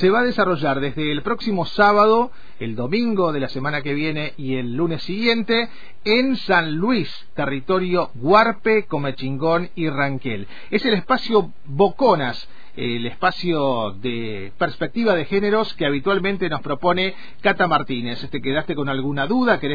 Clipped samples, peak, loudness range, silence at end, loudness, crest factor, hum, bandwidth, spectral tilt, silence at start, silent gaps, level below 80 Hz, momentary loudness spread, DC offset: under 0.1%; -2 dBFS; 2 LU; 0 s; -20 LUFS; 18 dB; none; 5 kHz; -7.5 dB/octave; 0 s; none; -50 dBFS; 10 LU; 4%